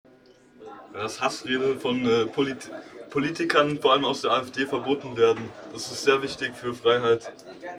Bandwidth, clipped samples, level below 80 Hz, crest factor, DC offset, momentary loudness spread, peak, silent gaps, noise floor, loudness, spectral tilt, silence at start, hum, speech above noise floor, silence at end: 13.5 kHz; under 0.1%; -64 dBFS; 20 dB; under 0.1%; 17 LU; -6 dBFS; none; -55 dBFS; -25 LUFS; -4 dB/octave; 0.6 s; none; 29 dB; 0 s